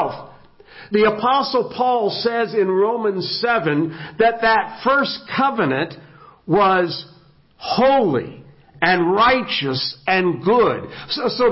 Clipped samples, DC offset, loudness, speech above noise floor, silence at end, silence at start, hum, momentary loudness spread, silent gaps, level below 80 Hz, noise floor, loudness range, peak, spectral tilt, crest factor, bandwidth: under 0.1%; under 0.1%; -18 LUFS; 32 dB; 0 s; 0 s; none; 9 LU; none; -54 dBFS; -50 dBFS; 2 LU; -2 dBFS; -9 dB/octave; 18 dB; 5.8 kHz